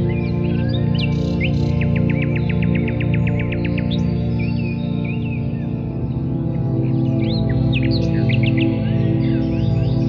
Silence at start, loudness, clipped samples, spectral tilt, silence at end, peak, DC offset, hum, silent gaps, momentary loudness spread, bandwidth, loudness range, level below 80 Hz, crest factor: 0 s; -19 LUFS; under 0.1%; -9 dB/octave; 0 s; -6 dBFS; under 0.1%; none; none; 5 LU; 6.4 kHz; 3 LU; -32 dBFS; 12 dB